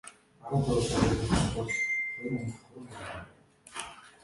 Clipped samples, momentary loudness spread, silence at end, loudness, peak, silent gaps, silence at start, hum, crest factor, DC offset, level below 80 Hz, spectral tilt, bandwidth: under 0.1%; 19 LU; 0.15 s; -31 LUFS; -10 dBFS; none; 0.05 s; none; 22 dB; under 0.1%; -44 dBFS; -5 dB/octave; 11.5 kHz